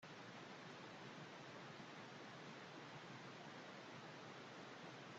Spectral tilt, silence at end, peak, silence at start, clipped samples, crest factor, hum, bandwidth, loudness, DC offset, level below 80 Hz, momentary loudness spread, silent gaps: -4.5 dB/octave; 0 s; -44 dBFS; 0 s; under 0.1%; 14 dB; none; 8.2 kHz; -56 LUFS; under 0.1%; under -90 dBFS; 0 LU; none